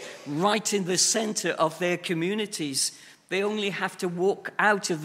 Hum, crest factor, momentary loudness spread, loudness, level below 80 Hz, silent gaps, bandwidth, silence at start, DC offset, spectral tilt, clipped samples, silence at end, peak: none; 20 dB; 7 LU; -26 LUFS; -78 dBFS; none; 16 kHz; 0 s; under 0.1%; -3 dB/octave; under 0.1%; 0 s; -6 dBFS